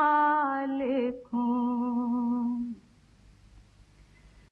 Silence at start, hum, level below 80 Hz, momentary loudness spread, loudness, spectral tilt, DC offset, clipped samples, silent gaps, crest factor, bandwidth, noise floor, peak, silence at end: 0 s; none; -62 dBFS; 9 LU; -29 LUFS; -7.5 dB/octave; under 0.1%; under 0.1%; none; 14 dB; 4.6 kHz; -58 dBFS; -14 dBFS; 0.9 s